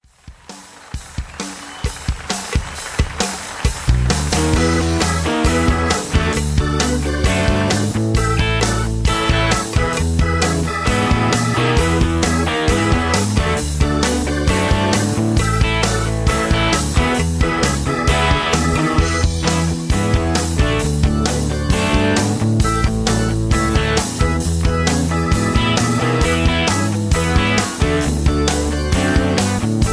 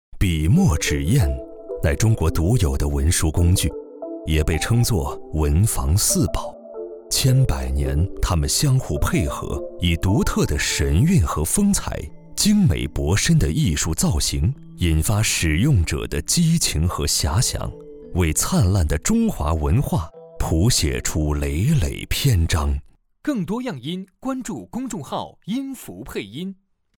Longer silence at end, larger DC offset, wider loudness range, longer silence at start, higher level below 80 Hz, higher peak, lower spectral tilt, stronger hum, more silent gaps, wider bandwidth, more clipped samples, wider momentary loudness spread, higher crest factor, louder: second, 0 s vs 0.45 s; neither; second, 1 LU vs 4 LU; about the same, 0.25 s vs 0.15 s; first, -22 dBFS vs -28 dBFS; first, 0 dBFS vs -6 dBFS; about the same, -5 dB/octave vs -5 dB/octave; neither; neither; second, 11 kHz vs 18.5 kHz; neither; second, 6 LU vs 12 LU; about the same, 16 dB vs 14 dB; first, -17 LUFS vs -21 LUFS